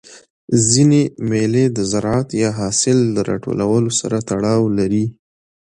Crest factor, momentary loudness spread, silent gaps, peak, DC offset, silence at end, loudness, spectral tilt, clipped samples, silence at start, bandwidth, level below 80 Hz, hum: 16 dB; 7 LU; 0.30-0.48 s; 0 dBFS; under 0.1%; 0.65 s; -17 LUFS; -5 dB/octave; under 0.1%; 0.1 s; 11 kHz; -48 dBFS; none